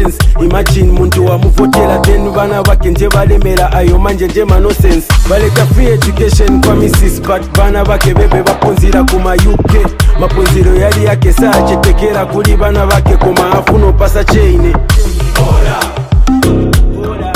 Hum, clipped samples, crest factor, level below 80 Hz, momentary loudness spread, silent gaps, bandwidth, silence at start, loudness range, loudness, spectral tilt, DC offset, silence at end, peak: none; 4%; 6 dB; -10 dBFS; 3 LU; none; 15.5 kHz; 0 s; 1 LU; -9 LUFS; -6 dB/octave; under 0.1%; 0 s; 0 dBFS